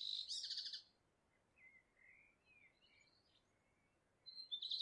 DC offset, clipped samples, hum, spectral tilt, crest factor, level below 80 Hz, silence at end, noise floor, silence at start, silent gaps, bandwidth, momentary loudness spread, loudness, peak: under 0.1%; under 0.1%; none; 2 dB/octave; 20 dB; under -90 dBFS; 0 s; -81 dBFS; 0 s; none; 11 kHz; 24 LU; -47 LUFS; -34 dBFS